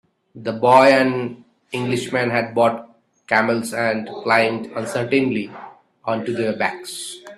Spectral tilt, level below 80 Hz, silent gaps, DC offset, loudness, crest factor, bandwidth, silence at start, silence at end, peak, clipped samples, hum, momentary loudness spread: -5 dB/octave; -64 dBFS; none; under 0.1%; -19 LUFS; 20 dB; 13.5 kHz; 0.35 s; 0.05 s; 0 dBFS; under 0.1%; none; 16 LU